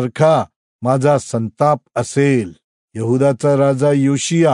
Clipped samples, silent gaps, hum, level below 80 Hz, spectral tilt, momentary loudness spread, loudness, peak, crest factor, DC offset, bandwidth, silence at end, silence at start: under 0.1%; 0.56-0.79 s, 2.64-2.88 s; none; -62 dBFS; -6.5 dB/octave; 10 LU; -16 LUFS; -2 dBFS; 14 dB; under 0.1%; 11 kHz; 0 s; 0 s